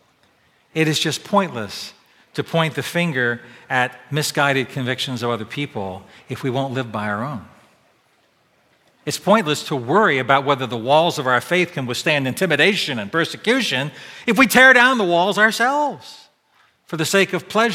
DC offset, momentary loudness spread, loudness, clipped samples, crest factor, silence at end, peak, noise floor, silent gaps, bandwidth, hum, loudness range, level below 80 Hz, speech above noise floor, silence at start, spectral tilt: under 0.1%; 14 LU; -18 LUFS; under 0.1%; 20 dB; 0 s; 0 dBFS; -60 dBFS; none; 17 kHz; none; 10 LU; -64 dBFS; 41 dB; 0.75 s; -4 dB/octave